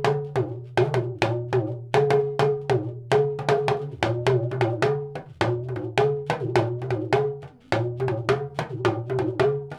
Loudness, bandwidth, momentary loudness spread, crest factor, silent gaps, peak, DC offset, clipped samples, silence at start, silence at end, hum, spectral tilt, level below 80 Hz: -25 LUFS; 11.5 kHz; 5 LU; 18 dB; none; -6 dBFS; under 0.1%; under 0.1%; 0 s; 0 s; none; -7 dB/octave; -56 dBFS